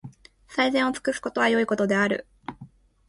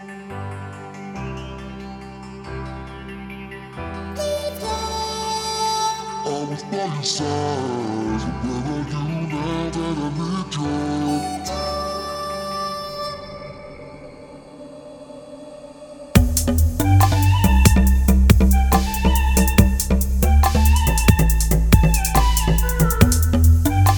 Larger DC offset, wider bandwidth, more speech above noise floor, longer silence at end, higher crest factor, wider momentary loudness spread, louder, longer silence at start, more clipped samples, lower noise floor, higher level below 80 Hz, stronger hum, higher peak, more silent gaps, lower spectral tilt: neither; second, 11.5 kHz vs over 20 kHz; first, 26 dB vs 17 dB; first, 0.4 s vs 0 s; about the same, 16 dB vs 18 dB; second, 17 LU vs 20 LU; second, -24 LUFS vs -19 LUFS; about the same, 0.05 s vs 0 s; neither; first, -49 dBFS vs -40 dBFS; second, -60 dBFS vs -22 dBFS; neither; second, -10 dBFS vs 0 dBFS; neither; about the same, -4.5 dB/octave vs -5.5 dB/octave